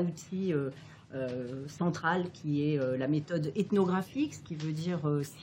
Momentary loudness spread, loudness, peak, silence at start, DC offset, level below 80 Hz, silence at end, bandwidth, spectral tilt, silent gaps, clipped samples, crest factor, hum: 9 LU; -33 LUFS; -14 dBFS; 0 s; under 0.1%; -70 dBFS; 0 s; 16.5 kHz; -7 dB/octave; none; under 0.1%; 18 dB; none